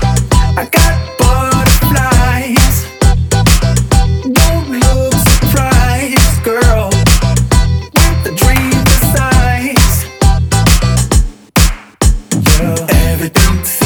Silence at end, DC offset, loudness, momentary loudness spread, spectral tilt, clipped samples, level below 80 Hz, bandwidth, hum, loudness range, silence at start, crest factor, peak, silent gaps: 0 s; under 0.1%; -11 LUFS; 3 LU; -4.5 dB/octave; 0.3%; -14 dBFS; over 20 kHz; none; 1 LU; 0 s; 10 dB; 0 dBFS; none